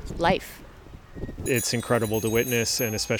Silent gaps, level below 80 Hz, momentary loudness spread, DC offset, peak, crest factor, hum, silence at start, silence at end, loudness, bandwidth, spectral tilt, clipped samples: none; -44 dBFS; 17 LU; under 0.1%; -6 dBFS; 20 dB; none; 0 s; 0 s; -25 LUFS; over 20 kHz; -4 dB/octave; under 0.1%